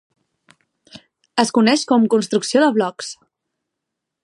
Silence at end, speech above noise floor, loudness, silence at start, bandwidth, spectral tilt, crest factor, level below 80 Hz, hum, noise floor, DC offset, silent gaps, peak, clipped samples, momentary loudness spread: 1.1 s; 64 dB; -17 LUFS; 0.95 s; 11.5 kHz; -4 dB/octave; 20 dB; -72 dBFS; none; -81 dBFS; under 0.1%; none; 0 dBFS; under 0.1%; 10 LU